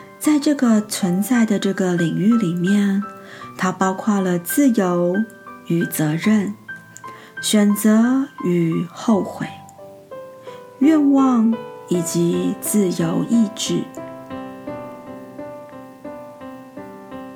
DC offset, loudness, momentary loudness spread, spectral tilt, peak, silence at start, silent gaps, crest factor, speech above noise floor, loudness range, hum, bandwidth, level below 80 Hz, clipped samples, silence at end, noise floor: under 0.1%; -18 LUFS; 21 LU; -5.5 dB/octave; -2 dBFS; 0 s; none; 16 dB; 23 dB; 6 LU; none; 17.5 kHz; -64 dBFS; under 0.1%; 0 s; -41 dBFS